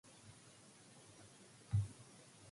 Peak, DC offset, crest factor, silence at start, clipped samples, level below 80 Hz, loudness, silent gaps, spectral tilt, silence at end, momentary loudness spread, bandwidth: -28 dBFS; under 0.1%; 20 dB; 0.05 s; under 0.1%; -62 dBFS; -43 LUFS; none; -5.5 dB/octave; 0 s; 20 LU; 11.5 kHz